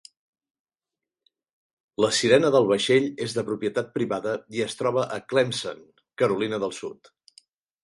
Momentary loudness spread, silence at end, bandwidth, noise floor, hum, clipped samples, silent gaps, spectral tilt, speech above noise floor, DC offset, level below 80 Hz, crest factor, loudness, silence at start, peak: 12 LU; 0.9 s; 11.5 kHz; -89 dBFS; none; under 0.1%; none; -4.5 dB/octave; 66 dB; under 0.1%; -66 dBFS; 22 dB; -24 LUFS; 2 s; -4 dBFS